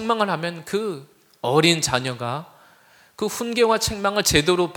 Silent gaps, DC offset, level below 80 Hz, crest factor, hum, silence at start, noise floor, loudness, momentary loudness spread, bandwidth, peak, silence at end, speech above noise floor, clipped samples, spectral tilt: none; under 0.1%; -48 dBFS; 22 dB; none; 0 s; -54 dBFS; -21 LUFS; 12 LU; 19.5 kHz; -2 dBFS; 0 s; 33 dB; under 0.1%; -3.5 dB/octave